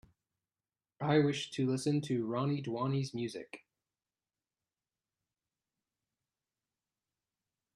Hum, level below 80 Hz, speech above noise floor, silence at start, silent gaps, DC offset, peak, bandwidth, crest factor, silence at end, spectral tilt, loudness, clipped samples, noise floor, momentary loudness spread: none; -78 dBFS; over 57 dB; 1 s; none; under 0.1%; -16 dBFS; 11.5 kHz; 22 dB; 4.15 s; -6.5 dB/octave; -34 LUFS; under 0.1%; under -90 dBFS; 13 LU